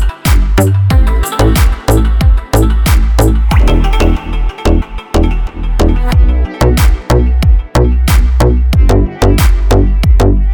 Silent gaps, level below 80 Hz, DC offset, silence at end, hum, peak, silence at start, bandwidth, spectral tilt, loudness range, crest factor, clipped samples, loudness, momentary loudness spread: none; -10 dBFS; under 0.1%; 0 s; none; 0 dBFS; 0 s; 19.5 kHz; -6.5 dB/octave; 2 LU; 8 dB; under 0.1%; -11 LUFS; 4 LU